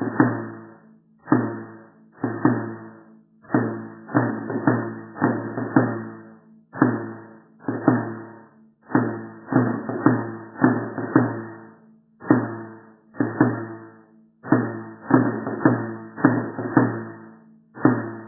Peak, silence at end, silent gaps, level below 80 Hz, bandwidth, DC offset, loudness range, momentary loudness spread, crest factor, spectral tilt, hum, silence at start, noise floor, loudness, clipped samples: -2 dBFS; 0 s; none; -68 dBFS; 2 kHz; under 0.1%; 4 LU; 17 LU; 22 dB; -15 dB/octave; none; 0 s; -53 dBFS; -23 LUFS; under 0.1%